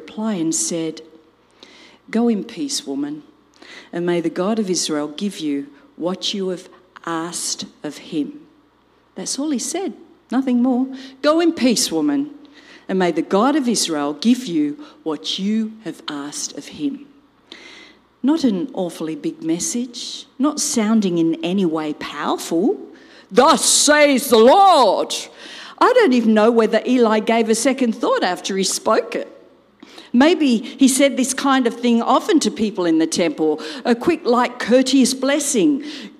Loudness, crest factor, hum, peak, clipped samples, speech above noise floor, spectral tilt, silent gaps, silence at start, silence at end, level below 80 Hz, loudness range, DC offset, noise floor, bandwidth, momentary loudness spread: -18 LUFS; 16 dB; none; -2 dBFS; under 0.1%; 38 dB; -3.5 dB/octave; none; 0 s; 0.1 s; -64 dBFS; 11 LU; under 0.1%; -56 dBFS; 15.5 kHz; 14 LU